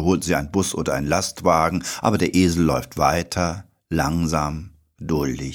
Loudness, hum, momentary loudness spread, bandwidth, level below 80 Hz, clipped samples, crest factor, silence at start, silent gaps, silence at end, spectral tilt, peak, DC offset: -21 LUFS; none; 8 LU; 19 kHz; -38 dBFS; under 0.1%; 18 dB; 0 s; none; 0 s; -5 dB/octave; -4 dBFS; under 0.1%